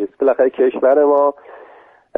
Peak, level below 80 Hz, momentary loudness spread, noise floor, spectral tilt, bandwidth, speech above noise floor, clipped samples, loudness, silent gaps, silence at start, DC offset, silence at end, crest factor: -2 dBFS; -66 dBFS; 5 LU; -46 dBFS; -8 dB/octave; 3.7 kHz; 32 dB; under 0.1%; -15 LUFS; none; 0 s; under 0.1%; 0.85 s; 14 dB